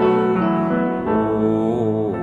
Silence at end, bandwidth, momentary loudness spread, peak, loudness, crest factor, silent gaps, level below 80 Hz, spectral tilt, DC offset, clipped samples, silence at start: 0 s; 7.6 kHz; 3 LU; -4 dBFS; -19 LUFS; 14 dB; none; -48 dBFS; -9.5 dB/octave; under 0.1%; under 0.1%; 0 s